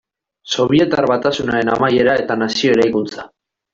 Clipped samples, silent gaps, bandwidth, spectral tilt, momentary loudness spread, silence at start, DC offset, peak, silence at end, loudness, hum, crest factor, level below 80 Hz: under 0.1%; none; 7.8 kHz; -5 dB/octave; 8 LU; 0.45 s; under 0.1%; -2 dBFS; 0.45 s; -16 LUFS; none; 14 dB; -50 dBFS